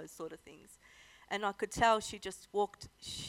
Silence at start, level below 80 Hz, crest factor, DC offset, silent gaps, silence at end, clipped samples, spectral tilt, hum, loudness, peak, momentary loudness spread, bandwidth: 0 s; -62 dBFS; 22 dB; under 0.1%; none; 0 s; under 0.1%; -3 dB/octave; none; -35 LUFS; -16 dBFS; 18 LU; 16 kHz